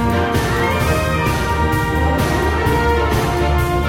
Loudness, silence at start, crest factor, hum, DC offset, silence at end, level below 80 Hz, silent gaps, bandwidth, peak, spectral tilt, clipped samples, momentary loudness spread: -17 LUFS; 0 s; 14 dB; none; under 0.1%; 0 s; -24 dBFS; none; 16.5 kHz; -4 dBFS; -6 dB/octave; under 0.1%; 1 LU